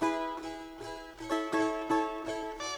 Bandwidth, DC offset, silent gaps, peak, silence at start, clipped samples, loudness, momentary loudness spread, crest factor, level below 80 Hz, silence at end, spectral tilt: 14.5 kHz; under 0.1%; none; -16 dBFS; 0 s; under 0.1%; -34 LUFS; 13 LU; 18 dB; -58 dBFS; 0 s; -3.5 dB/octave